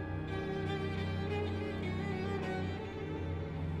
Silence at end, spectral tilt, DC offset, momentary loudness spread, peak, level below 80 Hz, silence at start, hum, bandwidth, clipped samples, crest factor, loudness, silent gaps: 0 s; -7.5 dB/octave; under 0.1%; 3 LU; -24 dBFS; -52 dBFS; 0 s; none; 9.4 kHz; under 0.1%; 12 dB; -38 LUFS; none